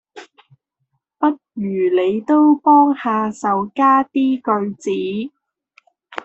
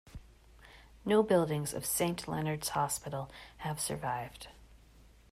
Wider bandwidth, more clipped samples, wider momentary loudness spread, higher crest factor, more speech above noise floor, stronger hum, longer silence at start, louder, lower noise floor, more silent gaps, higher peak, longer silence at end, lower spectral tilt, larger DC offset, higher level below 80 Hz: second, 8.2 kHz vs 16 kHz; neither; second, 12 LU vs 18 LU; about the same, 16 dB vs 20 dB; first, 56 dB vs 26 dB; neither; about the same, 0.15 s vs 0.05 s; first, -17 LUFS vs -33 LUFS; first, -72 dBFS vs -59 dBFS; neither; first, -2 dBFS vs -16 dBFS; second, 0.05 s vs 0.55 s; first, -6.5 dB/octave vs -4.5 dB/octave; neither; second, -66 dBFS vs -58 dBFS